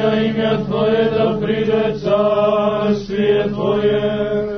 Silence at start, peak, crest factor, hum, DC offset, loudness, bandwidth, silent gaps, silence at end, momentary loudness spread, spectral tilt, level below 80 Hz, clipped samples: 0 s; -4 dBFS; 12 dB; none; under 0.1%; -17 LUFS; 6.4 kHz; none; 0 s; 3 LU; -7.5 dB/octave; -44 dBFS; under 0.1%